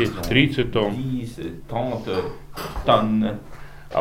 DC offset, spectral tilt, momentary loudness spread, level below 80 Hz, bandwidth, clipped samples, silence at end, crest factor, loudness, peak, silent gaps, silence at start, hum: under 0.1%; -6.5 dB/octave; 15 LU; -40 dBFS; 16 kHz; under 0.1%; 0 s; 20 dB; -23 LUFS; -2 dBFS; none; 0 s; none